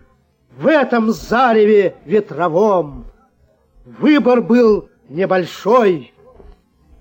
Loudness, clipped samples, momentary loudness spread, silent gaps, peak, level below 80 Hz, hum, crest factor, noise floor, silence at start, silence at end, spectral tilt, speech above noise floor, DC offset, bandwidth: -14 LUFS; under 0.1%; 8 LU; none; -2 dBFS; -46 dBFS; none; 14 dB; -56 dBFS; 0.6 s; 0.95 s; -6.5 dB/octave; 42 dB; under 0.1%; 17 kHz